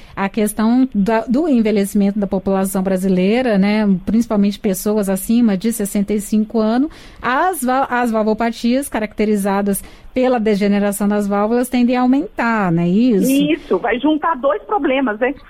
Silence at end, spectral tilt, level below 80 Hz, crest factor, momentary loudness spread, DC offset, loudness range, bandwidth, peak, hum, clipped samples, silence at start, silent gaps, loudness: 0.1 s; -6 dB/octave; -42 dBFS; 10 dB; 4 LU; under 0.1%; 2 LU; 16 kHz; -6 dBFS; none; under 0.1%; 0 s; none; -16 LUFS